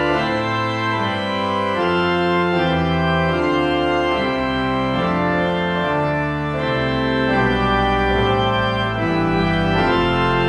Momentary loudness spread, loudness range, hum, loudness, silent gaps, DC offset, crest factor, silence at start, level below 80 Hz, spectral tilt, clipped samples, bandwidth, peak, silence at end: 3 LU; 2 LU; none; -18 LUFS; none; under 0.1%; 12 dB; 0 s; -34 dBFS; -7 dB/octave; under 0.1%; 10.5 kHz; -6 dBFS; 0 s